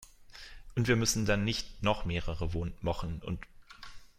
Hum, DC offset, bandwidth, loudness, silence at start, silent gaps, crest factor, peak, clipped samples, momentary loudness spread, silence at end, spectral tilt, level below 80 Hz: none; under 0.1%; 16 kHz; -33 LUFS; 0 s; none; 20 dB; -14 dBFS; under 0.1%; 23 LU; 0.1 s; -4.5 dB/octave; -44 dBFS